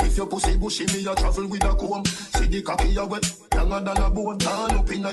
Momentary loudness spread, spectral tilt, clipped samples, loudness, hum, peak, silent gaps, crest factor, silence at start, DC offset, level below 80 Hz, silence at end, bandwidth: 2 LU; -4 dB/octave; under 0.1%; -24 LUFS; none; -8 dBFS; none; 14 dB; 0 s; under 0.1%; -24 dBFS; 0 s; 12.5 kHz